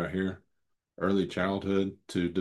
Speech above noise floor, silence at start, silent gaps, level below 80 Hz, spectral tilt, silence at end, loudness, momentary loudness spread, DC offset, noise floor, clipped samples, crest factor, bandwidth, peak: 50 dB; 0 s; none; -64 dBFS; -7 dB/octave; 0 s; -31 LUFS; 6 LU; under 0.1%; -79 dBFS; under 0.1%; 18 dB; 12 kHz; -14 dBFS